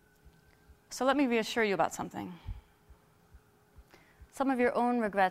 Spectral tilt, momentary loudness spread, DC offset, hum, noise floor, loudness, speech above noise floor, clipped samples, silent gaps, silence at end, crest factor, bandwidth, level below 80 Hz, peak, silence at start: -4.5 dB/octave; 17 LU; under 0.1%; none; -62 dBFS; -30 LUFS; 32 dB; under 0.1%; none; 0 s; 18 dB; 15.5 kHz; -56 dBFS; -14 dBFS; 0.9 s